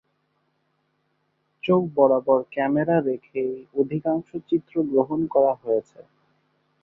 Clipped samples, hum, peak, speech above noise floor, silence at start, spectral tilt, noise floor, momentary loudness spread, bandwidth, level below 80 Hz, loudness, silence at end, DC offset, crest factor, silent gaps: under 0.1%; none; -4 dBFS; 49 dB; 1.65 s; -10 dB/octave; -71 dBFS; 9 LU; 3.9 kHz; -66 dBFS; -23 LUFS; 0.8 s; under 0.1%; 20 dB; none